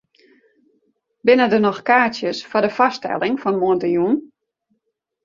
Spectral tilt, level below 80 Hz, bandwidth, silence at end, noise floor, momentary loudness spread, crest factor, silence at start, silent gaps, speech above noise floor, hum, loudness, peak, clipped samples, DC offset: -6 dB/octave; -64 dBFS; 7.4 kHz; 1 s; -74 dBFS; 7 LU; 18 dB; 1.25 s; none; 57 dB; none; -18 LUFS; -2 dBFS; under 0.1%; under 0.1%